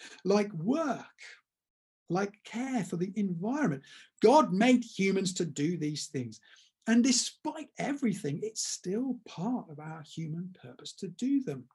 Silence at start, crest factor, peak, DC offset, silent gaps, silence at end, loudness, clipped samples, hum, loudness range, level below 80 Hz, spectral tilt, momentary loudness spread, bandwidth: 0 s; 20 dB; -12 dBFS; under 0.1%; 1.70-2.06 s; 0.1 s; -31 LUFS; under 0.1%; none; 7 LU; -80 dBFS; -4.5 dB/octave; 17 LU; 12 kHz